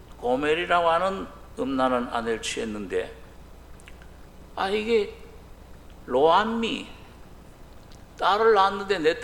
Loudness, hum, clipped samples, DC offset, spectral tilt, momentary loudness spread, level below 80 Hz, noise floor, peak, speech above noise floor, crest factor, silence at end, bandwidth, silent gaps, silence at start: -24 LUFS; none; under 0.1%; under 0.1%; -4 dB/octave; 15 LU; -48 dBFS; -46 dBFS; -6 dBFS; 22 dB; 20 dB; 0 s; 16 kHz; none; 0 s